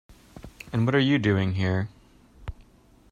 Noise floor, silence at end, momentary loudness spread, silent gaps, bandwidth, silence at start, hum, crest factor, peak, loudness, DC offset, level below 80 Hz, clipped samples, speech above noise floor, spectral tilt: -56 dBFS; 0.6 s; 21 LU; none; 9.8 kHz; 0.1 s; none; 18 dB; -10 dBFS; -25 LUFS; under 0.1%; -50 dBFS; under 0.1%; 33 dB; -7.5 dB/octave